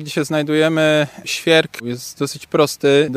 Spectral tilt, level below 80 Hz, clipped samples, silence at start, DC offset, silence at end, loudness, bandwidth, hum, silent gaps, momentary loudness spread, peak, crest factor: -4.5 dB/octave; -62 dBFS; under 0.1%; 0 s; under 0.1%; 0 s; -17 LUFS; 15.5 kHz; none; none; 10 LU; 0 dBFS; 16 dB